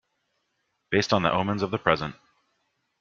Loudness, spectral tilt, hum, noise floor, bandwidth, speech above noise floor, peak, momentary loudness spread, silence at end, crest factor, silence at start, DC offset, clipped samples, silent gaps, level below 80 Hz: -25 LUFS; -5.5 dB/octave; none; -76 dBFS; 7.6 kHz; 51 dB; -2 dBFS; 5 LU; 0.9 s; 26 dB; 0.9 s; under 0.1%; under 0.1%; none; -58 dBFS